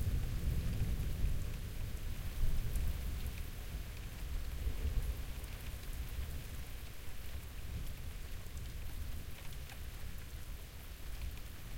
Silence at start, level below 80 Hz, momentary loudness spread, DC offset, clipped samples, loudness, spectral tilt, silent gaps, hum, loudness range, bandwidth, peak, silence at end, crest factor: 0 s; -42 dBFS; 10 LU; under 0.1%; under 0.1%; -44 LUFS; -5 dB/octave; none; none; 7 LU; 17 kHz; -22 dBFS; 0 s; 18 dB